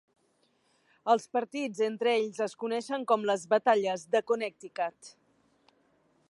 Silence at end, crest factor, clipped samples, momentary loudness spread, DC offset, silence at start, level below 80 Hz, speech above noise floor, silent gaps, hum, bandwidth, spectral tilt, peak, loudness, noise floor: 1.2 s; 20 dB; under 0.1%; 9 LU; under 0.1%; 1.05 s; -86 dBFS; 42 dB; none; none; 11.5 kHz; -4 dB/octave; -12 dBFS; -30 LUFS; -71 dBFS